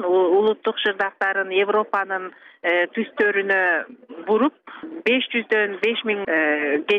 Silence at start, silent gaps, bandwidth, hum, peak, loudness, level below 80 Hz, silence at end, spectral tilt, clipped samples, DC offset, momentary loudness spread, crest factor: 0 s; none; 6 kHz; none; -6 dBFS; -21 LUFS; -74 dBFS; 0 s; -5.5 dB/octave; under 0.1%; under 0.1%; 9 LU; 14 dB